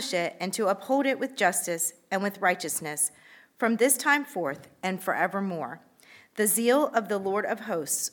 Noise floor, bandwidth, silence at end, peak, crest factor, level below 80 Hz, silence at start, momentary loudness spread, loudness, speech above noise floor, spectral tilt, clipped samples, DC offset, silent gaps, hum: -55 dBFS; 19 kHz; 0.05 s; -8 dBFS; 20 dB; -82 dBFS; 0 s; 10 LU; -27 LUFS; 28 dB; -3 dB/octave; under 0.1%; under 0.1%; none; none